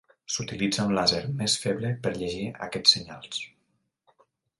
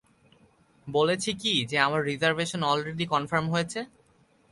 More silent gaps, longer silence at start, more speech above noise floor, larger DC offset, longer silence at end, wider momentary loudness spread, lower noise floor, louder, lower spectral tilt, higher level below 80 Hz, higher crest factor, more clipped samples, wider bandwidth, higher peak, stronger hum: neither; second, 0.3 s vs 0.85 s; first, 47 dB vs 36 dB; neither; first, 1.1 s vs 0.65 s; first, 14 LU vs 8 LU; first, -74 dBFS vs -63 dBFS; about the same, -26 LUFS vs -26 LUFS; about the same, -3.5 dB/octave vs -4 dB/octave; first, -58 dBFS vs -64 dBFS; about the same, 26 dB vs 22 dB; neither; about the same, 11.5 kHz vs 11.5 kHz; about the same, -4 dBFS vs -6 dBFS; neither